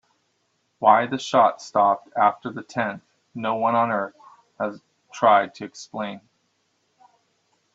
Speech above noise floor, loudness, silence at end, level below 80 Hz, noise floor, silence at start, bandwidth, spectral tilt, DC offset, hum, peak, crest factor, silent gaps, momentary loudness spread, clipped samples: 49 dB; -22 LUFS; 1.55 s; -72 dBFS; -71 dBFS; 0.8 s; 8 kHz; -5 dB/octave; under 0.1%; none; -2 dBFS; 22 dB; none; 16 LU; under 0.1%